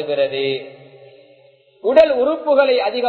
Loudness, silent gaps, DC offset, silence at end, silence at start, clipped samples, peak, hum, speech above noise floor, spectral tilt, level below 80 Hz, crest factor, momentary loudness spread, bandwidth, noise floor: -16 LUFS; none; under 0.1%; 0 s; 0 s; under 0.1%; 0 dBFS; none; 35 dB; -6 dB/octave; -58 dBFS; 18 dB; 11 LU; 6.2 kHz; -51 dBFS